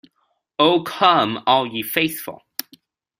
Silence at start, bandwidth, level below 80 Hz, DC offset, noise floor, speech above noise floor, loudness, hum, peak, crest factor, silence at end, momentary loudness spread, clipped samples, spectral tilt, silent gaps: 0.6 s; 16 kHz; -64 dBFS; under 0.1%; -69 dBFS; 51 dB; -18 LUFS; none; -2 dBFS; 20 dB; 0.85 s; 16 LU; under 0.1%; -4 dB/octave; none